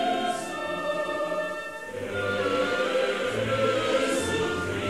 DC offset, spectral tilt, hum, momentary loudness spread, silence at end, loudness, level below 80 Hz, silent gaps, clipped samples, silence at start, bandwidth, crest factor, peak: 0.2%; -4 dB/octave; none; 7 LU; 0 s; -27 LUFS; -58 dBFS; none; under 0.1%; 0 s; 15.5 kHz; 14 dB; -14 dBFS